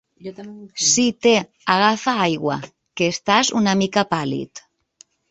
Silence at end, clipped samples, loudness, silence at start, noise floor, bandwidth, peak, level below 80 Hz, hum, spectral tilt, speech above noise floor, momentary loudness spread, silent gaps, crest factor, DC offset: 0.7 s; under 0.1%; -19 LUFS; 0.25 s; -54 dBFS; 8.2 kHz; -2 dBFS; -60 dBFS; none; -3 dB/octave; 35 dB; 19 LU; none; 18 dB; under 0.1%